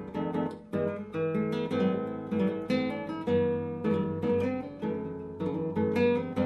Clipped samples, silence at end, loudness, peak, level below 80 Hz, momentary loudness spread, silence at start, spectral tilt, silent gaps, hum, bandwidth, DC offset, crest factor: under 0.1%; 0 s; -31 LUFS; -16 dBFS; -64 dBFS; 7 LU; 0 s; -8.5 dB/octave; none; none; 12 kHz; under 0.1%; 14 dB